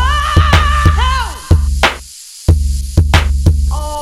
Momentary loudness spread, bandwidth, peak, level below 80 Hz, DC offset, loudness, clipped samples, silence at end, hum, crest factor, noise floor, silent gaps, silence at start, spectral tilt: 8 LU; 13.5 kHz; 0 dBFS; -14 dBFS; under 0.1%; -13 LUFS; under 0.1%; 0 s; none; 12 dB; -33 dBFS; none; 0 s; -5 dB/octave